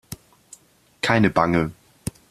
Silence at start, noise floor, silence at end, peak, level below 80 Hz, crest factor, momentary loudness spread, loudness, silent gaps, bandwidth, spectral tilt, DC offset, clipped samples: 0.1 s; -51 dBFS; 0.2 s; -2 dBFS; -48 dBFS; 22 dB; 20 LU; -21 LUFS; none; 14.5 kHz; -5.5 dB/octave; under 0.1%; under 0.1%